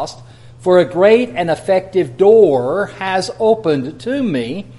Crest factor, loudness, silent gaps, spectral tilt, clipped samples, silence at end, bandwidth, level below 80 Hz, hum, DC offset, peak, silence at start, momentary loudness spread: 14 dB; -14 LUFS; none; -6 dB/octave; under 0.1%; 0 s; 11.5 kHz; -52 dBFS; none; under 0.1%; 0 dBFS; 0 s; 10 LU